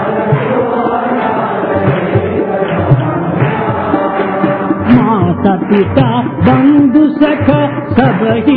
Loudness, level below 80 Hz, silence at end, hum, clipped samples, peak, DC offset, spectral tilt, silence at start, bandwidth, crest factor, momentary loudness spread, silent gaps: -11 LUFS; -40 dBFS; 0 s; none; 0.4%; 0 dBFS; under 0.1%; -11.5 dB/octave; 0 s; 4.7 kHz; 10 dB; 5 LU; none